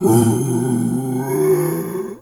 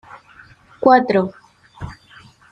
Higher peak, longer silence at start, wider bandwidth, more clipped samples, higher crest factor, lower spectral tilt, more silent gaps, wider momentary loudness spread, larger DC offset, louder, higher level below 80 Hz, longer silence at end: about the same, -2 dBFS vs -2 dBFS; second, 0 s vs 0.8 s; first, 18.5 kHz vs 7.8 kHz; neither; about the same, 16 dB vs 18 dB; about the same, -7 dB/octave vs -7.5 dB/octave; neither; second, 7 LU vs 22 LU; neither; about the same, -18 LUFS vs -16 LUFS; about the same, -54 dBFS vs -50 dBFS; second, 0.05 s vs 0.6 s